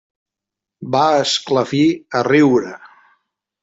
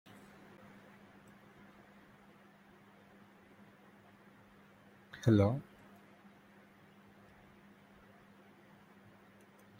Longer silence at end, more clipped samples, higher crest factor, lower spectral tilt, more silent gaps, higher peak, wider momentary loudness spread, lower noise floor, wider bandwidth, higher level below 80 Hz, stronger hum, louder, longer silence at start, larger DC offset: second, 0.75 s vs 4.2 s; neither; second, 16 dB vs 28 dB; second, -5 dB/octave vs -8 dB/octave; neither; first, -2 dBFS vs -14 dBFS; second, 8 LU vs 26 LU; first, -85 dBFS vs -62 dBFS; second, 8 kHz vs 16 kHz; first, -60 dBFS vs -74 dBFS; neither; first, -16 LUFS vs -32 LUFS; second, 0.8 s vs 5.15 s; neither